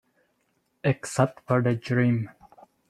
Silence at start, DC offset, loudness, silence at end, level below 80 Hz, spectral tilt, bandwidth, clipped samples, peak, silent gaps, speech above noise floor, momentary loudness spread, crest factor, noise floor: 0.85 s; under 0.1%; -26 LUFS; 0.6 s; -64 dBFS; -7 dB/octave; 12.5 kHz; under 0.1%; -6 dBFS; none; 48 dB; 6 LU; 22 dB; -72 dBFS